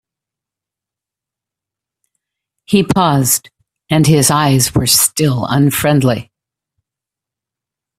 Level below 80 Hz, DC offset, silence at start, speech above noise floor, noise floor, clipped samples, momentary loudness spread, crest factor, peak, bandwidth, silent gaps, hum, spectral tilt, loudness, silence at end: -44 dBFS; under 0.1%; 2.7 s; 74 dB; -86 dBFS; under 0.1%; 6 LU; 16 dB; 0 dBFS; 16 kHz; none; none; -4.5 dB/octave; -12 LUFS; 1.75 s